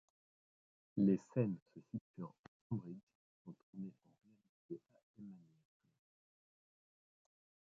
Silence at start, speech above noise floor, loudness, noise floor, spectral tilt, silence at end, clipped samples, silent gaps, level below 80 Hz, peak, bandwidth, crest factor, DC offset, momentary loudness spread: 0.95 s; over 48 dB; -42 LUFS; under -90 dBFS; -11 dB/octave; 2.3 s; under 0.1%; 1.62-1.66 s, 2.01-2.14 s, 2.39-2.70 s, 3.03-3.07 s, 3.15-3.45 s, 3.63-3.73 s, 4.49-4.69 s, 5.03-5.14 s; -80 dBFS; -22 dBFS; 7.4 kHz; 24 dB; under 0.1%; 23 LU